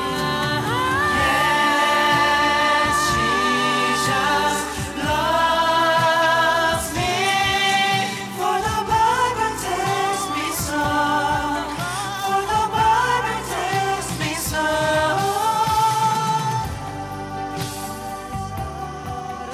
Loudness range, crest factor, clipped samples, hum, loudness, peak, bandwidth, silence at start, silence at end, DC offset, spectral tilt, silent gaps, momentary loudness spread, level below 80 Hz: 4 LU; 14 dB; under 0.1%; none; -20 LUFS; -6 dBFS; 16 kHz; 0 s; 0 s; under 0.1%; -3 dB/octave; none; 12 LU; -42 dBFS